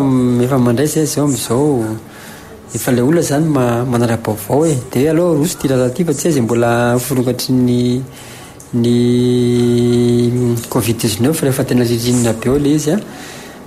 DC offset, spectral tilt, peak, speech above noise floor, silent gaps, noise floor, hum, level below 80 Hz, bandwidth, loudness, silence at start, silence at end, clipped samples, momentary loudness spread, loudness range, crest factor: under 0.1%; -6 dB/octave; -4 dBFS; 20 dB; none; -34 dBFS; none; -42 dBFS; 16 kHz; -14 LUFS; 0 s; 0 s; under 0.1%; 10 LU; 2 LU; 10 dB